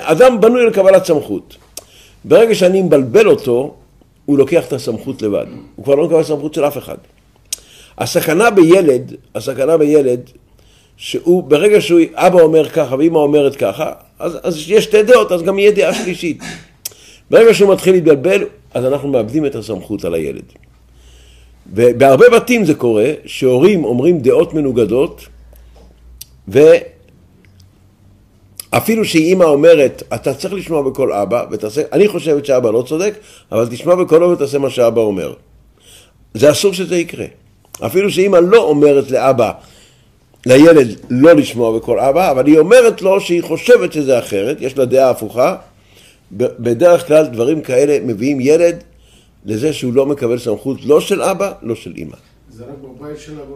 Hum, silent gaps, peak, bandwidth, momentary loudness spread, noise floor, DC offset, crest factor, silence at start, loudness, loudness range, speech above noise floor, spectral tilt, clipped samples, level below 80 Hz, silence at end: none; none; 0 dBFS; 15.5 kHz; 16 LU; -49 dBFS; under 0.1%; 12 dB; 0 s; -12 LUFS; 6 LU; 38 dB; -5.5 dB/octave; under 0.1%; -48 dBFS; 0 s